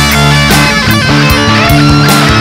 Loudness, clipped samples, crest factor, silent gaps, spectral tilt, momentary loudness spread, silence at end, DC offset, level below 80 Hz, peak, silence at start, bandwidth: -6 LUFS; 3%; 6 dB; none; -4.5 dB/octave; 1 LU; 0 s; under 0.1%; -20 dBFS; 0 dBFS; 0 s; 16.5 kHz